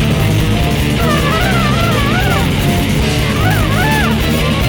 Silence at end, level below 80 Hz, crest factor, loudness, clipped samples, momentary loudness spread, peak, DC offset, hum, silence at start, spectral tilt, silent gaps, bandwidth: 0 s; -22 dBFS; 12 dB; -13 LUFS; under 0.1%; 1 LU; 0 dBFS; under 0.1%; none; 0 s; -5.5 dB/octave; none; over 20 kHz